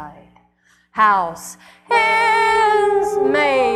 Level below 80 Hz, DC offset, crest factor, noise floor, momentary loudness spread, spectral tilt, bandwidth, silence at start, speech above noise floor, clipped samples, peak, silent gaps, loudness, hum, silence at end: -54 dBFS; under 0.1%; 16 dB; -58 dBFS; 13 LU; -3 dB/octave; 13.5 kHz; 0 s; 41 dB; under 0.1%; -2 dBFS; none; -16 LUFS; 60 Hz at -55 dBFS; 0 s